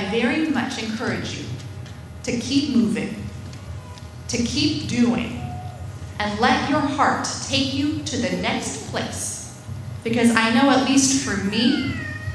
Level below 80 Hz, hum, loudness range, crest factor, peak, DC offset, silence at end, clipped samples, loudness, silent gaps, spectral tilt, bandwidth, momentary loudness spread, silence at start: -46 dBFS; none; 5 LU; 20 dB; -2 dBFS; under 0.1%; 0 s; under 0.1%; -21 LUFS; none; -4 dB/octave; 11 kHz; 17 LU; 0 s